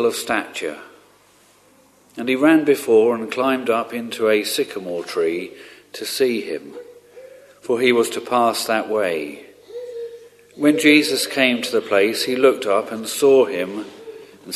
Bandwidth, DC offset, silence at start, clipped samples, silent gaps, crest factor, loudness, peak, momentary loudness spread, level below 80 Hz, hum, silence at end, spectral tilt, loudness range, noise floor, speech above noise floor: 13.5 kHz; under 0.1%; 0 s; under 0.1%; none; 20 dB; -19 LUFS; 0 dBFS; 20 LU; -68 dBFS; 50 Hz at -60 dBFS; 0 s; -3.5 dB/octave; 6 LU; -54 dBFS; 35 dB